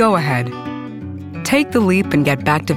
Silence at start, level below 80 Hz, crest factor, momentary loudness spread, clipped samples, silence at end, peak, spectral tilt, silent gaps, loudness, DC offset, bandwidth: 0 s; -50 dBFS; 16 dB; 14 LU; under 0.1%; 0 s; 0 dBFS; -6 dB/octave; none; -17 LUFS; under 0.1%; 16.5 kHz